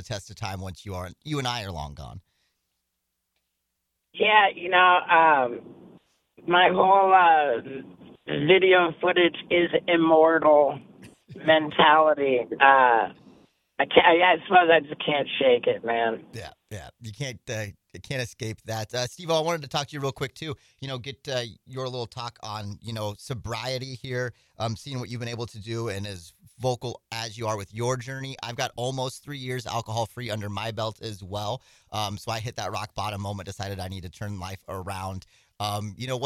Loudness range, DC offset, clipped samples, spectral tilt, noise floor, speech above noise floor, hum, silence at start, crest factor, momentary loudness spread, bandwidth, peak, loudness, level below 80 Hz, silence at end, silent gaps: 13 LU; under 0.1%; under 0.1%; -4.5 dB/octave; -80 dBFS; 55 dB; none; 0 s; 24 dB; 19 LU; 15.5 kHz; 0 dBFS; -24 LUFS; -58 dBFS; 0 s; none